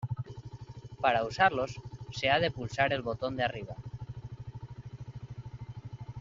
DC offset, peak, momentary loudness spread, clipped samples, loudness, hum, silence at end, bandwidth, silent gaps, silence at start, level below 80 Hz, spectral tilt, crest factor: under 0.1%; -10 dBFS; 19 LU; under 0.1%; -30 LUFS; none; 0 s; 7.4 kHz; none; 0 s; -56 dBFS; -3 dB/octave; 24 dB